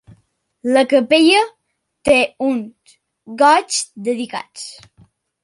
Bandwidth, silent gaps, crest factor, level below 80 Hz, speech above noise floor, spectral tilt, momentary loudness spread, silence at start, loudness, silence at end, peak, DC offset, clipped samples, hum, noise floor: 11.5 kHz; none; 16 dB; -54 dBFS; 45 dB; -2.5 dB/octave; 20 LU; 0.65 s; -16 LUFS; 0.7 s; -2 dBFS; under 0.1%; under 0.1%; none; -61 dBFS